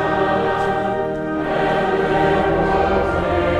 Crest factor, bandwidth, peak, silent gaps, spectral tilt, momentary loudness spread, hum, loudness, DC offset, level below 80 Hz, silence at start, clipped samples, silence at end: 12 dB; 11 kHz; -6 dBFS; none; -7 dB/octave; 5 LU; none; -18 LUFS; under 0.1%; -34 dBFS; 0 s; under 0.1%; 0 s